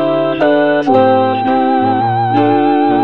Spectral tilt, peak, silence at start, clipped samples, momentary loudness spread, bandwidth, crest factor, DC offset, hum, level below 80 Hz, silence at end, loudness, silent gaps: -8.5 dB/octave; 0 dBFS; 0 s; under 0.1%; 3 LU; 6 kHz; 12 dB; 1%; none; -54 dBFS; 0 s; -12 LUFS; none